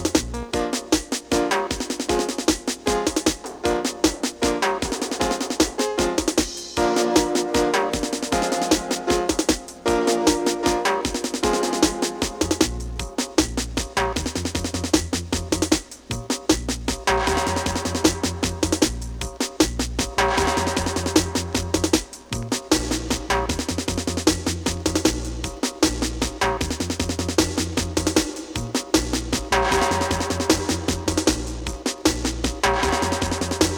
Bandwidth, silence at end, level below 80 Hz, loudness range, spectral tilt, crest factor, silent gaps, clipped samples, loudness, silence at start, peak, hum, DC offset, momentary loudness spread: 20 kHz; 0 s; -36 dBFS; 2 LU; -3.5 dB/octave; 22 dB; none; under 0.1%; -23 LUFS; 0 s; 0 dBFS; none; under 0.1%; 6 LU